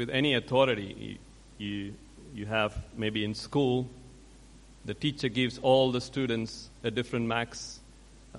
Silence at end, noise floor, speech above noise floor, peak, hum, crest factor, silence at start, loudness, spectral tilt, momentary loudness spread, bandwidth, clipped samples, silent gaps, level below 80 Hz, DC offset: 0 s; -53 dBFS; 23 dB; -10 dBFS; none; 22 dB; 0 s; -30 LUFS; -5.5 dB/octave; 18 LU; 11.5 kHz; under 0.1%; none; -54 dBFS; under 0.1%